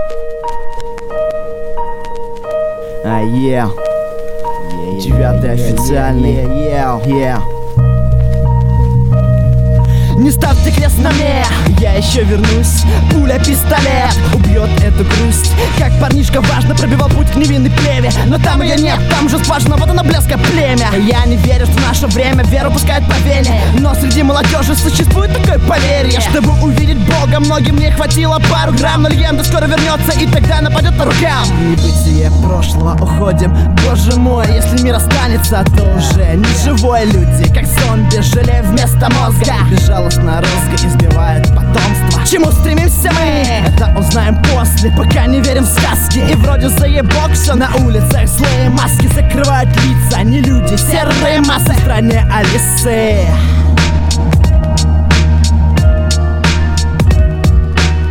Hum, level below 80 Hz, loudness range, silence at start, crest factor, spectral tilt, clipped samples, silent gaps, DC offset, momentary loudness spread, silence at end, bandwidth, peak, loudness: none; -14 dBFS; 3 LU; 0 s; 10 dB; -5.5 dB/octave; under 0.1%; none; 2%; 3 LU; 0 s; 18.5 kHz; 0 dBFS; -11 LUFS